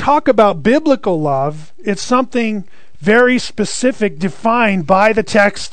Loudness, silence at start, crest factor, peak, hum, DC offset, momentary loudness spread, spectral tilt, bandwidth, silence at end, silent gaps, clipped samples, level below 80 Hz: -14 LUFS; 0 s; 14 dB; 0 dBFS; none; 5%; 10 LU; -5 dB/octave; 9.4 kHz; 0.05 s; none; 0.2%; -46 dBFS